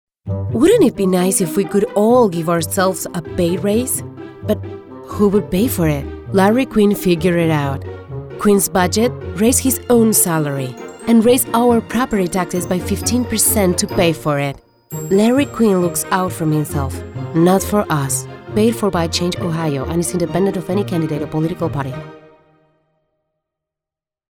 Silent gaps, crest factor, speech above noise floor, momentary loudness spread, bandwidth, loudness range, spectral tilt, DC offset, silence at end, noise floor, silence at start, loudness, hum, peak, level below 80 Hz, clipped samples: none; 16 dB; 72 dB; 11 LU; over 20 kHz; 5 LU; -5 dB/octave; under 0.1%; 2.2 s; -88 dBFS; 0.25 s; -16 LUFS; none; -2 dBFS; -40 dBFS; under 0.1%